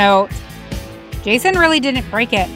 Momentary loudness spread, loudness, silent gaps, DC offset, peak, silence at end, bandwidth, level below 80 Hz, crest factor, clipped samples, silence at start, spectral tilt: 17 LU; -15 LUFS; none; under 0.1%; 0 dBFS; 0 s; 17 kHz; -32 dBFS; 16 dB; under 0.1%; 0 s; -4 dB/octave